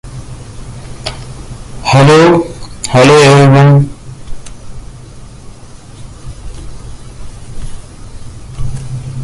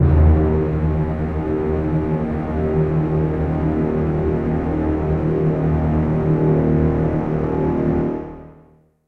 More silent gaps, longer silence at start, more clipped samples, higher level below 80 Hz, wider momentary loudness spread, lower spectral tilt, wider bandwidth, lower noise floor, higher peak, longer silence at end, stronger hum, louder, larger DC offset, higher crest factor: neither; about the same, 0.05 s vs 0 s; neither; about the same, -30 dBFS vs -26 dBFS; first, 27 LU vs 5 LU; second, -6 dB/octave vs -11.5 dB/octave; first, 11.5 kHz vs 4.1 kHz; second, -31 dBFS vs -51 dBFS; about the same, 0 dBFS vs -2 dBFS; second, 0 s vs 0.55 s; neither; first, -7 LUFS vs -19 LUFS; neither; about the same, 12 dB vs 16 dB